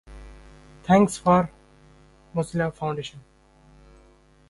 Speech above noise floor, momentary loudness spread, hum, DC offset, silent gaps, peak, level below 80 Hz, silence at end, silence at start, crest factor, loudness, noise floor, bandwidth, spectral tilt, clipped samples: 34 dB; 19 LU; none; under 0.1%; none; -4 dBFS; -50 dBFS; 1.3 s; 0.1 s; 22 dB; -23 LUFS; -55 dBFS; 11.5 kHz; -6.5 dB/octave; under 0.1%